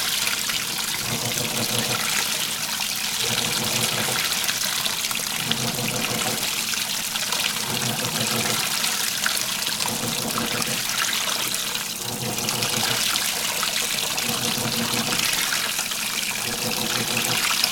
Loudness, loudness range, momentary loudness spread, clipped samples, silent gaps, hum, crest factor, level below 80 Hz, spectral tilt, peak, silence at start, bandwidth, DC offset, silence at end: -22 LUFS; 1 LU; 3 LU; under 0.1%; none; none; 24 dB; -56 dBFS; -1 dB/octave; -2 dBFS; 0 s; over 20 kHz; under 0.1%; 0 s